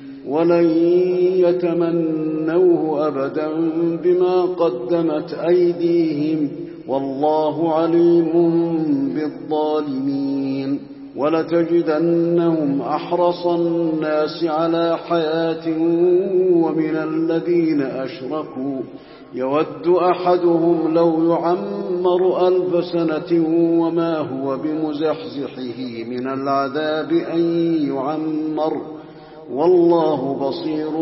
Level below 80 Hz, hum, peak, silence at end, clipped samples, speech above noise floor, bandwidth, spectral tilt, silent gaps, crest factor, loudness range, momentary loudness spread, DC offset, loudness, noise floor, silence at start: -64 dBFS; none; -4 dBFS; 0 s; under 0.1%; 20 dB; 5.8 kHz; -11.5 dB/octave; none; 14 dB; 4 LU; 9 LU; under 0.1%; -19 LUFS; -38 dBFS; 0 s